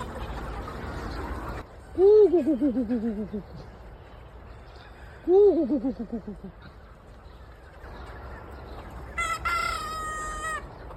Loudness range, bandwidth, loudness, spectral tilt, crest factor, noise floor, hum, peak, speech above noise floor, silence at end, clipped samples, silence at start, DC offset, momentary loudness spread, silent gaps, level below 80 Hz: 11 LU; 13 kHz; -26 LUFS; -6 dB/octave; 16 dB; -47 dBFS; none; -10 dBFS; 25 dB; 0 s; under 0.1%; 0 s; under 0.1%; 27 LU; none; -44 dBFS